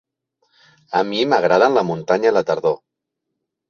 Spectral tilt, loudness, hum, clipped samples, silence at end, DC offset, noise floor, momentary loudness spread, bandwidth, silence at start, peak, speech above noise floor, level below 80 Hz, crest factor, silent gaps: -5.5 dB/octave; -17 LUFS; none; under 0.1%; 0.95 s; under 0.1%; -79 dBFS; 8 LU; 7 kHz; 0.9 s; -2 dBFS; 62 dB; -64 dBFS; 18 dB; none